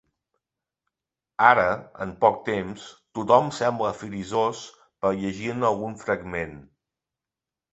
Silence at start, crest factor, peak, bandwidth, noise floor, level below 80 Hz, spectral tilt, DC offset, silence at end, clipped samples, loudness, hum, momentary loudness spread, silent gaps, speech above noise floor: 1.4 s; 24 dB; -2 dBFS; 8.2 kHz; -89 dBFS; -58 dBFS; -5.5 dB/octave; under 0.1%; 1.1 s; under 0.1%; -24 LUFS; none; 17 LU; none; 65 dB